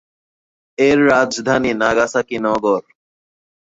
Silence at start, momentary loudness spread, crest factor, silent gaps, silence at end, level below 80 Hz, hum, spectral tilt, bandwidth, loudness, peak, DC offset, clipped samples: 0.8 s; 6 LU; 16 dB; none; 0.9 s; -52 dBFS; none; -4.5 dB/octave; 7.8 kHz; -16 LUFS; -2 dBFS; under 0.1%; under 0.1%